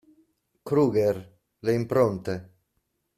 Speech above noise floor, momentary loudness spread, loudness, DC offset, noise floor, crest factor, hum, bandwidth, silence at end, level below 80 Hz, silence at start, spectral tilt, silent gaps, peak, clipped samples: 52 dB; 12 LU; -26 LUFS; under 0.1%; -76 dBFS; 18 dB; none; 14.5 kHz; 0.7 s; -62 dBFS; 0.65 s; -8 dB/octave; none; -10 dBFS; under 0.1%